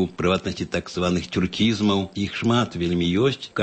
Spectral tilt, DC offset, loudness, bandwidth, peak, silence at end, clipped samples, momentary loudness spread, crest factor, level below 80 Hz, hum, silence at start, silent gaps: -6 dB/octave; under 0.1%; -23 LUFS; 8.6 kHz; -8 dBFS; 0 s; under 0.1%; 6 LU; 14 dB; -48 dBFS; none; 0 s; none